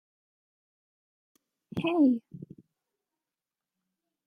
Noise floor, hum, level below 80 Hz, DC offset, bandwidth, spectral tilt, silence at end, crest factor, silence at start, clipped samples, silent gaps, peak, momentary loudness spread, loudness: under -90 dBFS; none; -74 dBFS; under 0.1%; 4.9 kHz; -8 dB/octave; 1.9 s; 20 dB; 1.75 s; under 0.1%; none; -14 dBFS; 23 LU; -27 LUFS